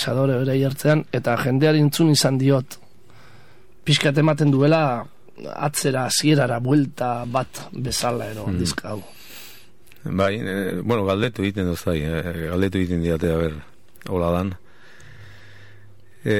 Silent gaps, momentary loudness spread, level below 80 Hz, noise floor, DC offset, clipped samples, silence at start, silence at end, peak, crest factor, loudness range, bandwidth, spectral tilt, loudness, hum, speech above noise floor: none; 17 LU; -46 dBFS; -52 dBFS; 0.9%; under 0.1%; 0 s; 0 s; -2 dBFS; 20 dB; 6 LU; 16.5 kHz; -5.5 dB/octave; -21 LUFS; none; 32 dB